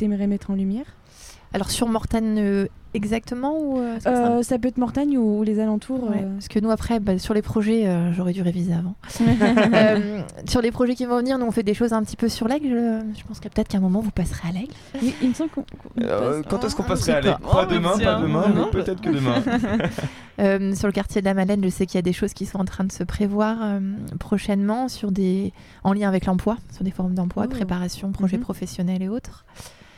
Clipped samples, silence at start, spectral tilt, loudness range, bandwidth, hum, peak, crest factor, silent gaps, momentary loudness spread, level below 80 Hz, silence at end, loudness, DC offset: under 0.1%; 0 s; -6.5 dB/octave; 4 LU; 15 kHz; none; -2 dBFS; 20 dB; none; 9 LU; -40 dBFS; 0.25 s; -22 LUFS; under 0.1%